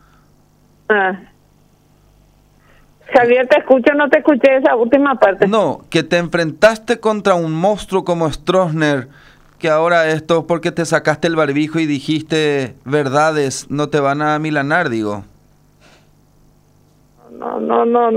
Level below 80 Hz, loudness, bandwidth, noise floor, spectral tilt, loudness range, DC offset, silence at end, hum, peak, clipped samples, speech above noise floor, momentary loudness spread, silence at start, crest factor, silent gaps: -48 dBFS; -15 LUFS; 15 kHz; -52 dBFS; -5.5 dB/octave; 7 LU; under 0.1%; 0 s; 50 Hz at -50 dBFS; 0 dBFS; under 0.1%; 37 dB; 8 LU; 0.9 s; 16 dB; none